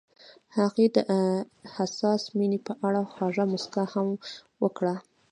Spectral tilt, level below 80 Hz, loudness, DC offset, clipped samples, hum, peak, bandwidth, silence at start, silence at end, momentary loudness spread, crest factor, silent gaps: -6.5 dB/octave; -76 dBFS; -28 LUFS; under 0.1%; under 0.1%; none; -8 dBFS; 10 kHz; 0.55 s; 0.3 s; 9 LU; 20 dB; none